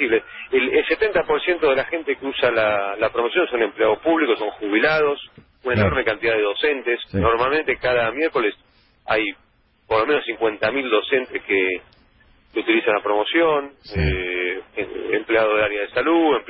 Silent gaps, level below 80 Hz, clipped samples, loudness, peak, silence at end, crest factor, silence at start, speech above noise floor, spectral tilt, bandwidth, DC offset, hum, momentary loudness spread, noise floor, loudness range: none; -40 dBFS; under 0.1%; -20 LUFS; -4 dBFS; 0 s; 16 dB; 0 s; 35 dB; -10 dB/octave; 5.8 kHz; under 0.1%; none; 6 LU; -55 dBFS; 2 LU